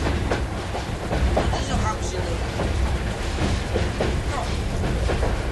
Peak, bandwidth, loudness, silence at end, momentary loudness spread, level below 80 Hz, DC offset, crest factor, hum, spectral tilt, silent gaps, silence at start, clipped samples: -8 dBFS; 12 kHz; -25 LUFS; 0 s; 4 LU; -26 dBFS; under 0.1%; 14 dB; none; -5.5 dB/octave; none; 0 s; under 0.1%